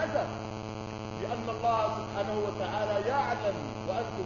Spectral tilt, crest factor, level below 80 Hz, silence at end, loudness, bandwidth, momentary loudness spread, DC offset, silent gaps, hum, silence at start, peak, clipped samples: -6 dB/octave; 16 dB; -56 dBFS; 0 s; -32 LUFS; 7.2 kHz; 9 LU; under 0.1%; none; none; 0 s; -16 dBFS; under 0.1%